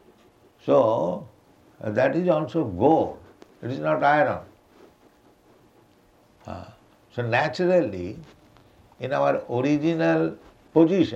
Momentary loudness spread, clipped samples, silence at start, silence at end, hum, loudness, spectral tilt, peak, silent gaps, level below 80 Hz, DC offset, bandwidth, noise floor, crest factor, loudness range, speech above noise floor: 17 LU; under 0.1%; 0.65 s; 0 s; none; -23 LUFS; -7.5 dB/octave; -6 dBFS; none; -62 dBFS; under 0.1%; 8 kHz; -58 dBFS; 20 dB; 5 LU; 36 dB